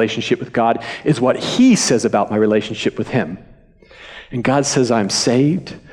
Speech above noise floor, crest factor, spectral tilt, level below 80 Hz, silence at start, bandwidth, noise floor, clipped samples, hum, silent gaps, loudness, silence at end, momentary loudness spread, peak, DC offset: 29 dB; 14 dB; -4.5 dB/octave; -52 dBFS; 0 s; 12 kHz; -45 dBFS; under 0.1%; none; none; -16 LUFS; 0 s; 11 LU; -4 dBFS; under 0.1%